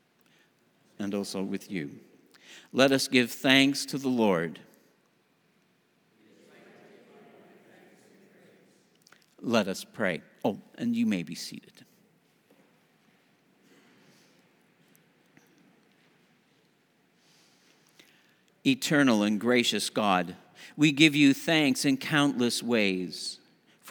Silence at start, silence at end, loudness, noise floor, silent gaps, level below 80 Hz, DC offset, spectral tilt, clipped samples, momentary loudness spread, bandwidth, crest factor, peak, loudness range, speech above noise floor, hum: 1 s; 0 s; -26 LUFS; -68 dBFS; none; -78 dBFS; under 0.1%; -4 dB/octave; under 0.1%; 16 LU; over 20 kHz; 26 dB; -4 dBFS; 12 LU; 42 dB; none